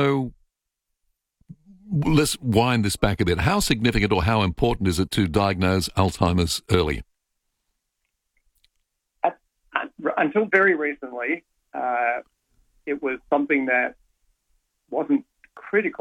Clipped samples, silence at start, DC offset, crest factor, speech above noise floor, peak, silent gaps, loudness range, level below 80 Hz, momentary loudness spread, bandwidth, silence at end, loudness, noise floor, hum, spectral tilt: under 0.1%; 0 s; under 0.1%; 20 dB; 59 dB; -4 dBFS; none; 6 LU; -42 dBFS; 9 LU; 18 kHz; 0.05 s; -23 LUFS; -81 dBFS; none; -5.5 dB/octave